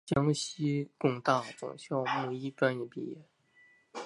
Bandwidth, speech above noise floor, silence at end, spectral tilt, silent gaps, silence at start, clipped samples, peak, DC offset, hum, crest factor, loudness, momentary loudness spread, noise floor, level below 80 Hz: 11.5 kHz; 32 dB; 0 s; -5.5 dB/octave; none; 0.05 s; under 0.1%; -10 dBFS; under 0.1%; none; 22 dB; -33 LUFS; 13 LU; -64 dBFS; -66 dBFS